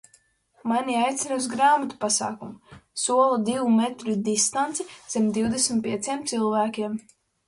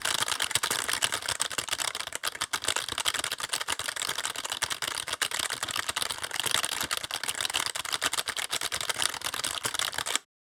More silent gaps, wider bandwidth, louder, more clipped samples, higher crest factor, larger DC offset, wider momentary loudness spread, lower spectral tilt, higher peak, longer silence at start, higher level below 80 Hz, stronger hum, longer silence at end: neither; second, 11.5 kHz vs over 20 kHz; first, -24 LUFS vs -29 LUFS; neither; second, 18 dB vs 26 dB; neither; first, 11 LU vs 4 LU; first, -3.5 dB/octave vs 0.5 dB/octave; about the same, -6 dBFS vs -6 dBFS; first, 0.65 s vs 0 s; about the same, -62 dBFS vs -62 dBFS; neither; first, 0.45 s vs 0.3 s